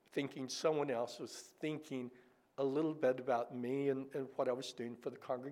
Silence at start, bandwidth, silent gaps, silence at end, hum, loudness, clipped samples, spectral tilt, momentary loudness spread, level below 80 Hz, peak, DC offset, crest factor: 0.15 s; 15.5 kHz; none; 0 s; none; -40 LUFS; under 0.1%; -5 dB/octave; 10 LU; under -90 dBFS; -22 dBFS; under 0.1%; 18 dB